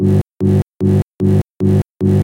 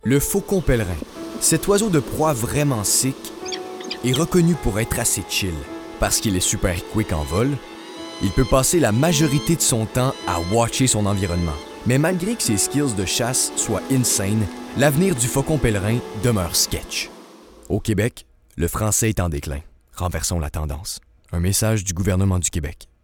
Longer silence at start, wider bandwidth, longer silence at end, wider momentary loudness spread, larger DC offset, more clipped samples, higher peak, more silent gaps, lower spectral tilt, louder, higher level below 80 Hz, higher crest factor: about the same, 0 s vs 0.05 s; second, 10.5 kHz vs 19.5 kHz; second, 0 s vs 0.2 s; second, 0 LU vs 12 LU; neither; neither; about the same, -2 dBFS vs -4 dBFS; first, 0.21-0.26 s, 0.62-0.73 s, 1.03-1.14 s, 1.90-1.95 s vs none; first, -10 dB/octave vs -4.5 dB/octave; first, -15 LUFS vs -20 LUFS; about the same, -38 dBFS vs -36 dBFS; second, 12 dB vs 18 dB